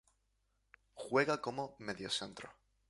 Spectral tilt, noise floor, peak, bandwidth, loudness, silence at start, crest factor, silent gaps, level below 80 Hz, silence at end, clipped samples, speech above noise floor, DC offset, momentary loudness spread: -3.5 dB/octave; -80 dBFS; -18 dBFS; 11.5 kHz; -38 LUFS; 0.95 s; 22 dB; none; -74 dBFS; 0.4 s; under 0.1%; 42 dB; under 0.1%; 19 LU